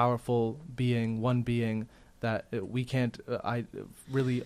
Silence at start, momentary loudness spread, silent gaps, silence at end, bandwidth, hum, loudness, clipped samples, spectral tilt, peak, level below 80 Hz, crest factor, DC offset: 0 s; 8 LU; none; 0 s; 13 kHz; none; -32 LUFS; under 0.1%; -7.5 dB/octave; -14 dBFS; -58 dBFS; 18 dB; under 0.1%